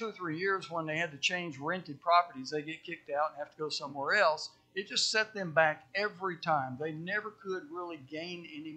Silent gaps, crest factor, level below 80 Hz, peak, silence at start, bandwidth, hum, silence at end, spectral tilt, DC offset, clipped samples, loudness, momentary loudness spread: none; 22 dB; -82 dBFS; -12 dBFS; 0 s; 9.4 kHz; none; 0 s; -3 dB/octave; under 0.1%; under 0.1%; -33 LUFS; 13 LU